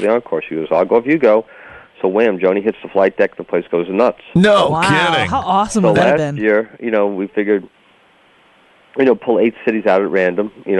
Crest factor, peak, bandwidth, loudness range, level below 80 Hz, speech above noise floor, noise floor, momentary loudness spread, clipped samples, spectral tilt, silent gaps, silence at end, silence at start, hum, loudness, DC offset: 14 dB; -2 dBFS; 11.5 kHz; 4 LU; -50 dBFS; 36 dB; -51 dBFS; 6 LU; under 0.1%; -6 dB/octave; none; 0 s; 0 s; none; -15 LUFS; under 0.1%